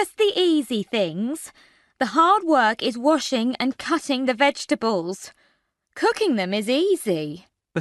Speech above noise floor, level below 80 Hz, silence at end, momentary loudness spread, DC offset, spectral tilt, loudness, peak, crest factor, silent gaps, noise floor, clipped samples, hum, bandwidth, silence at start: 46 dB; -68 dBFS; 0 s; 14 LU; under 0.1%; -4 dB/octave; -22 LUFS; -6 dBFS; 16 dB; none; -68 dBFS; under 0.1%; none; 12 kHz; 0 s